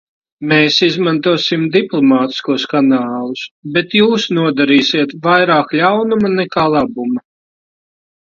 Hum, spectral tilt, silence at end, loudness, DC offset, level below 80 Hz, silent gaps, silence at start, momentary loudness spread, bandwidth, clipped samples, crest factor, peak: none; -5.5 dB/octave; 1.1 s; -13 LUFS; under 0.1%; -56 dBFS; 3.51-3.63 s; 0.4 s; 9 LU; 7.4 kHz; under 0.1%; 14 dB; 0 dBFS